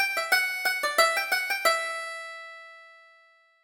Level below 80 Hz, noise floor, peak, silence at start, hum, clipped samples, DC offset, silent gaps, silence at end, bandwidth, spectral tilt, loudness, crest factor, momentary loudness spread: -72 dBFS; -60 dBFS; -8 dBFS; 0 s; none; under 0.1%; under 0.1%; none; 0.7 s; over 20 kHz; 2 dB/octave; -25 LUFS; 20 dB; 17 LU